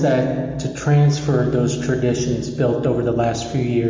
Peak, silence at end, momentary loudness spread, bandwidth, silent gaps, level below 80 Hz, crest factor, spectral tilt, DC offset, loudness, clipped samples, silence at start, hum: -8 dBFS; 0 s; 6 LU; 7.6 kHz; none; -42 dBFS; 10 dB; -7 dB/octave; under 0.1%; -19 LUFS; under 0.1%; 0 s; none